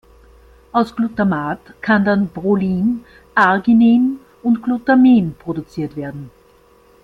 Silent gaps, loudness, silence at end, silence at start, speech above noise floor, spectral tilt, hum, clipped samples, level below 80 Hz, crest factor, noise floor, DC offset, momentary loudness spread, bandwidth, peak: none; -16 LUFS; 0.75 s; 0.75 s; 35 dB; -8.5 dB/octave; none; under 0.1%; -50 dBFS; 16 dB; -50 dBFS; under 0.1%; 14 LU; 5.2 kHz; -2 dBFS